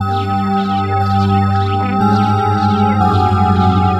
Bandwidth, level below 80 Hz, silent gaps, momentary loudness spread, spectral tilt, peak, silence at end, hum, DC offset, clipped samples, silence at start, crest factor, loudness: 8.2 kHz; -40 dBFS; none; 4 LU; -8 dB/octave; -2 dBFS; 0 s; none; under 0.1%; under 0.1%; 0 s; 12 dB; -14 LUFS